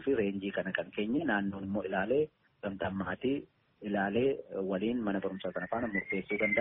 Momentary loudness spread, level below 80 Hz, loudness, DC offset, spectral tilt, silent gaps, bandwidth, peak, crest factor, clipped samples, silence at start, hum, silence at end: 7 LU; -64 dBFS; -34 LUFS; under 0.1%; -5 dB/octave; none; 3.9 kHz; -14 dBFS; 18 dB; under 0.1%; 0 s; none; 0 s